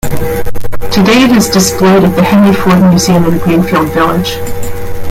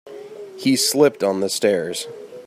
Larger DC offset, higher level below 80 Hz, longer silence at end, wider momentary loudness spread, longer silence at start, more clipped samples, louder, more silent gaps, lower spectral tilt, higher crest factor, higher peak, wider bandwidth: neither; first, -26 dBFS vs -70 dBFS; about the same, 0 s vs 0 s; second, 14 LU vs 20 LU; about the same, 0.05 s vs 0.05 s; neither; first, -8 LUFS vs -19 LUFS; neither; first, -5.5 dB/octave vs -3.5 dB/octave; second, 8 dB vs 18 dB; about the same, 0 dBFS vs -2 dBFS; about the same, 16.5 kHz vs 16 kHz